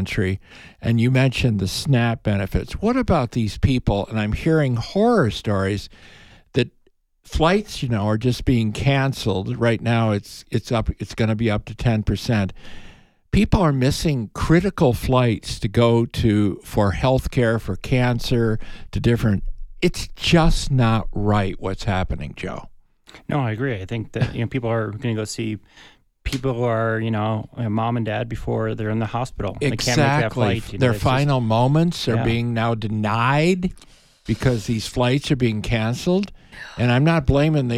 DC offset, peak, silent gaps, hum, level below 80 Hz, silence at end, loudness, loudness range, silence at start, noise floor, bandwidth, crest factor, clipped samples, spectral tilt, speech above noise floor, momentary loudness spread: under 0.1%; -2 dBFS; none; none; -34 dBFS; 0 s; -21 LUFS; 5 LU; 0 s; -60 dBFS; 14.5 kHz; 18 dB; under 0.1%; -6.5 dB/octave; 40 dB; 9 LU